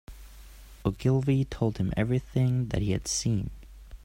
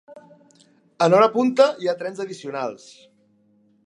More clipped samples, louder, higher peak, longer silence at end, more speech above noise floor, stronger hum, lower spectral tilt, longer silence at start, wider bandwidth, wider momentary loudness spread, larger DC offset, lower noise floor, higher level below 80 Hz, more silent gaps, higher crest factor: neither; second, -28 LUFS vs -20 LUFS; second, -12 dBFS vs -2 dBFS; second, 0.05 s vs 1.1 s; second, 21 dB vs 40 dB; neither; about the same, -6 dB/octave vs -5.5 dB/octave; about the same, 0.1 s vs 0.1 s; first, 15 kHz vs 11 kHz; second, 6 LU vs 15 LU; neither; second, -48 dBFS vs -60 dBFS; first, -44 dBFS vs -76 dBFS; neither; about the same, 18 dB vs 20 dB